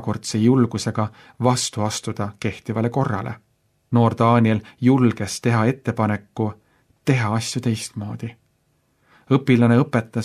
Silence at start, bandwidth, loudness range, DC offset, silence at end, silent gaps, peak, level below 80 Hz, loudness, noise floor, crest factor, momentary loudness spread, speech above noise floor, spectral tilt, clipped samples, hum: 0 s; 13 kHz; 5 LU; under 0.1%; 0 s; none; -2 dBFS; -58 dBFS; -21 LUFS; -65 dBFS; 18 dB; 12 LU; 45 dB; -6 dB/octave; under 0.1%; none